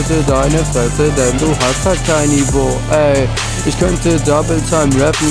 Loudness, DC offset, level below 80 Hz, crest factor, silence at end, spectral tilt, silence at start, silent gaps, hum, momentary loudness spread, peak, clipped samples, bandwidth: -13 LUFS; 0.1%; -22 dBFS; 12 dB; 0 s; -5 dB/octave; 0 s; none; none; 3 LU; 0 dBFS; under 0.1%; 11 kHz